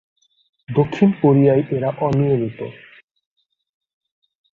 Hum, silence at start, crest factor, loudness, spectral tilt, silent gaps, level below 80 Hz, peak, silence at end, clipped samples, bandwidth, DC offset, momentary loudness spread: none; 0.7 s; 18 dB; -18 LUFS; -10 dB/octave; none; -54 dBFS; -2 dBFS; 1.85 s; under 0.1%; 7 kHz; under 0.1%; 12 LU